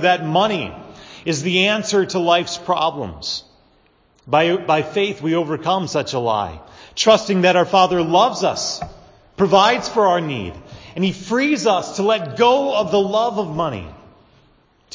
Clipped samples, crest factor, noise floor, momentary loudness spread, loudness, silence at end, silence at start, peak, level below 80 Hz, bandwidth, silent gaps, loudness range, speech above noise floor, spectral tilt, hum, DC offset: under 0.1%; 18 dB; -57 dBFS; 14 LU; -18 LUFS; 1 s; 0 s; 0 dBFS; -50 dBFS; 7.6 kHz; none; 4 LU; 39 dB; -4.5 dB/octave; none; under 0.1%